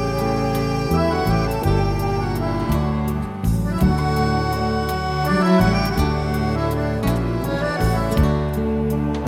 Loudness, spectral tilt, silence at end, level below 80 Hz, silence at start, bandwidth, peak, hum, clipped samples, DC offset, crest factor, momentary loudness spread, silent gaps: -20 LUFS; -7 dB/octave; 0 s; -28 dBFS; 0 s; 17 kHz; -4 dBFS; none; under 0.1%; under 0.1%; 16 dB; 4 LU; none